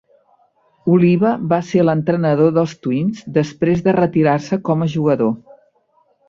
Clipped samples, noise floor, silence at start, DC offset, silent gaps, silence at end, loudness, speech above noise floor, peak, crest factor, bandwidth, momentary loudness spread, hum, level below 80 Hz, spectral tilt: under 0.1%; -59 dBFS; 0.85 s; under 0.1%; none; 0.9 s; -16 LUFS; 44 dB; -2 dBFS; 16 dB; 7.4 kHz; 6 LU; none; -54 dBFS; -8.5 dB/octave